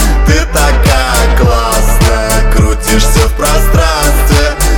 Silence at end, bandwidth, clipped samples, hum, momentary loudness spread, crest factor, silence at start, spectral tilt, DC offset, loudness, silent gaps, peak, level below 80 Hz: 0 s; 18.5 kHz; under 0.1%; none; 2 LU; 8 dB; 0 s; -4.5 dB/octave; under 0.1%; -10 LUFS; none; 0 dBFS; -10 dBFS